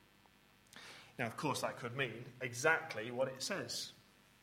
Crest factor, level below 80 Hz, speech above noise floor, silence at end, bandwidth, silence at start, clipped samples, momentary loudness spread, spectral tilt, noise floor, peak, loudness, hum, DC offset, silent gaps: 26 dB; -78 dBFS; 28 dB; 0.4 s; 16.5 kHz; 0.75 s; under 0.1%; 19 LU; -3.5 dB/octave; -67 dBFS; -16 dBFS; -39 LUFS; none; under 0.1%; none